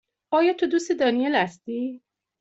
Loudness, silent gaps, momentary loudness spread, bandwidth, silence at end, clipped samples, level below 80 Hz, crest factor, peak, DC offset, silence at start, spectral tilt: -24 LUFS; none; 10 LU; 8 kHz; 0.45 s; under 0.1%; -70 dBFS; 16 dB; -8 dBFS; under 0.1%; 0.3 s; -4.5 dB/octave